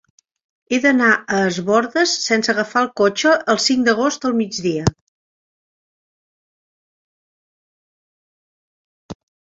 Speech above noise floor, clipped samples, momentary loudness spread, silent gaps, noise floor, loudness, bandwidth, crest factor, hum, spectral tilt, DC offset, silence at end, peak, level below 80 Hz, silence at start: over 73 dB; under 0.1%; 6 LU; 5.01-9.09 s; under -90 dBFS; -17 LUFS; 7.8 kHz; 18 dB; none; -4 dB/octave; under 0.1%; 0.4 s; -2 dBFS; -50 dBFS; 0.7 s